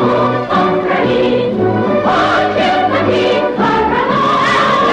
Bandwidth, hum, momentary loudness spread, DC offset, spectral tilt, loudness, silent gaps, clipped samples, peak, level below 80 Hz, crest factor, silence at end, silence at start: 10 kHz; none; 3 LU; under 0.1%; -6 dB/octave; -12 LUFS; none; under 0.1%; 0 dBFS; -42 dBFS; 12 dB; 0 s; 0 s